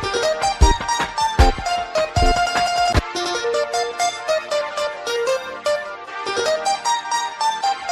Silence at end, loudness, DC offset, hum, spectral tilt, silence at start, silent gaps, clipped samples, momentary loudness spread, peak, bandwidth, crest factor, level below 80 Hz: 0 s; -20 LUFS; under 0.1%; none; -3.5 dB/octave; 0 s; none; under 0.1%; 6 LU; 0 dBFS; 14.5 kHz; 20 dB; -26 dBFS